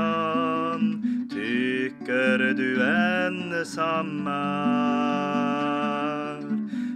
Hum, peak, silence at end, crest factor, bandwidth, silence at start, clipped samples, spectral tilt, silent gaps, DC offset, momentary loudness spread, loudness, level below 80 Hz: none; -10 dBFS; 0 s; 16 dB; 11 kHz; 0 s; under 0.1%; -6 dB/octave; none; under 0.1%; 7 LU; -25 LUFS; -72 dBFS